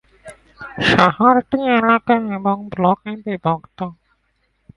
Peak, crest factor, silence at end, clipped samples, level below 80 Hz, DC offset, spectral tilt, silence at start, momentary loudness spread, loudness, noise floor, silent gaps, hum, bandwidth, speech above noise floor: 0 dBFS; 18 dB; 0.85 s; under 0.1%; -50 dBFS; under 0.1%; -6.5 dB/octave; 0.25 s; 17 LU; -17 LUFS; -65 dBFS; none; none; 11.5 kHz; 49 dB